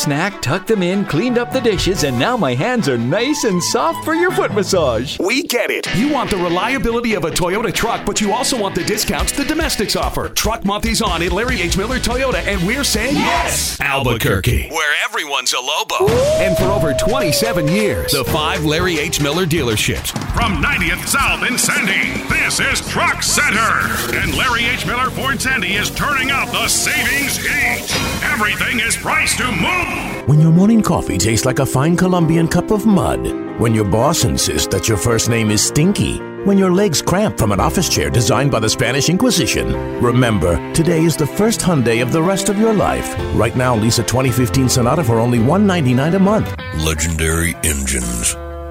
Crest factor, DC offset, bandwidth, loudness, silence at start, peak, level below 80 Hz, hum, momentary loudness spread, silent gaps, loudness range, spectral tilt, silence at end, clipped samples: 16 dB; under 0.1%; 16.5 kHz; -15 LUFS; 0 s; 0 dBFS; -30 dBFS; none; 4 LU; none; 3 LU; -4 dB/octave; 0 s; under 0.1%